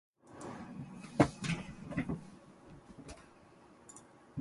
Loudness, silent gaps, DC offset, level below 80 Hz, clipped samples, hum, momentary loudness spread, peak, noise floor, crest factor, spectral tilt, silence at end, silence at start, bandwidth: -38 LUFS; none; under 0.1%; -60 dBFS; under 0.1%; none; 26 LU; -12 dBFS; -60 dBFS; 28 dB; -6 dB/octave; 0 s; 0.25 s; 11.5 kHz